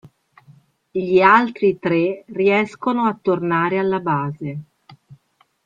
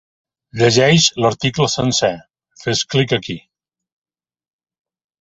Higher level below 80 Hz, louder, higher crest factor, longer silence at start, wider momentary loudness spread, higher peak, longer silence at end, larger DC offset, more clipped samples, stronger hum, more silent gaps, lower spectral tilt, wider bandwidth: second, -62 dBFS vs -50 dBFS; second, -18 LUFS vs -15 LUFS; about the same, 18 dB vs 18 dB; first, 0.95 s vs 0.55 s; second, 14 LU vs 18 LU; about the same, 0 dBFS vs -2 dBFS; second, 0.5 s vs 1.85 s; neither; neither; neither; neither; first, -8 dB/octave vs -4 dB/octave; second, 7.4 kHz vs 8.2 kHz